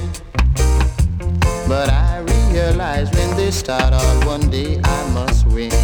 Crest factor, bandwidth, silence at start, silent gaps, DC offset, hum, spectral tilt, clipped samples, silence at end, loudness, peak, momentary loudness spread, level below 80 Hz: 12 dB; 19.5 kHz; 0 s; none; under 0.1%; none; -5.5 dB/octave; under 0.1%; 0 s; -17 LUFS; -4 dBFS; 3 LU; -18 dBFS